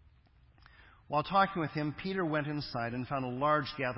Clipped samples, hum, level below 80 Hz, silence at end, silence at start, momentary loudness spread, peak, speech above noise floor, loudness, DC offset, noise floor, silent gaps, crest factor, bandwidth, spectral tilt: under 0.1%; none; -62 dBFS; 0 s; 0.8 s; 7 LU; -14 dBFS; 31 dB; -33 LUFS; under 0.1%; -63 dBFS; none; 20 dB; 5.8 kHz; -9.5 dB/octave